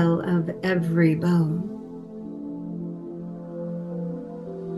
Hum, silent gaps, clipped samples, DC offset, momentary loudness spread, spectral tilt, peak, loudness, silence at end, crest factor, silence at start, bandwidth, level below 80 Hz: none; none; under 0.1%; under 0.1%; 15 LU; -9 dB/octave; -8 dBFS; -26 LUFS; 0 s; 18 dB; 0 s; 11.5 kHz; -62 dBFS